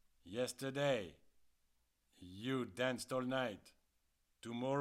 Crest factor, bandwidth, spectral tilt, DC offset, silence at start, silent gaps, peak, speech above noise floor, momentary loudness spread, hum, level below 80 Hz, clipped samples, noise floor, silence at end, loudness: 18 dB; 16 kHz; -5 dB/octave; under 0.1%; 0.25 s; none; -24 dBFS; 39 dB; 17 LU; none; -78 dBFS; under 0.1%; -80 dBFS; 0 s; -41 LUFS